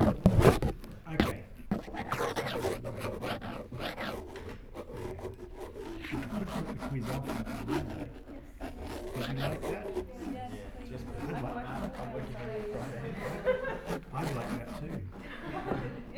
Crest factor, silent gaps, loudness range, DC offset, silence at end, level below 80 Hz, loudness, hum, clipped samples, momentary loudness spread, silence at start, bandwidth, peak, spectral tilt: 28 dB; none; 4 LU; under 0.1%; 0 s; -46 dBFS; -36 LUFS; none; under 0.1%; 12 LU; 0 s; over 20 kHz; -6 dBFS; -6.5 dB/octave